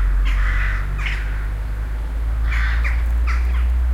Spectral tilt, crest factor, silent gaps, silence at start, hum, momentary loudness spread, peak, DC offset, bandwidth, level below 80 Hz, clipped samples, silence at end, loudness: -6 dB/octave; 10 dB; none; 0 s; none; 6 LU; -8 dBFS; under 0.1%; 7.4 kHz; -18 dBFS; under 0.1%; 0 s; -22 LUFS